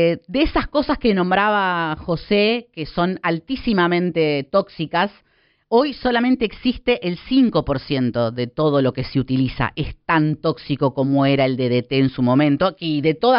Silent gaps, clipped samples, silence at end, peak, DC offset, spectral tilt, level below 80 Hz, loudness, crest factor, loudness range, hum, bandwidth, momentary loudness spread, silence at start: none; under 0.1%; 0 s; -4 dBFS; under 0.1%; -5 dB/octave; -40 dBFS; -19 LUFS; 14 dB; 2 LU; none; 5.6 kHz; 6 LU; 0 s